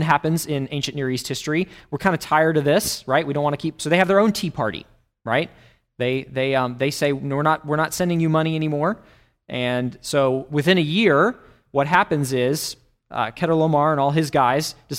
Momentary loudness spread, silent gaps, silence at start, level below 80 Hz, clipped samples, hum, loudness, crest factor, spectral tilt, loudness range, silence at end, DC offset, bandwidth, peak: 9 LU; none; 0 s; -54 dBFS; under 0.1%; none; -21 LUFS; 20 dB; -5 dB/octave; 2 LU; 0 s; under 0.1%; 16 kHz; -2 dBFS